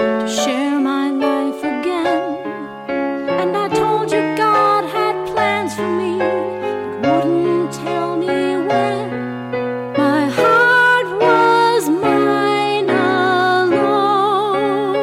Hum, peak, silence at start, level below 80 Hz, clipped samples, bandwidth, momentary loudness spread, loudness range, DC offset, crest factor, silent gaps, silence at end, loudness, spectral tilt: none; -6 dBFS; 0 s; -56 dBFS; under 0.1%; 16 kHz; 9 LU; 5 LU; under 0.1%; 12 dB; none; 0 s; -16 LUFS; -5 dB/octave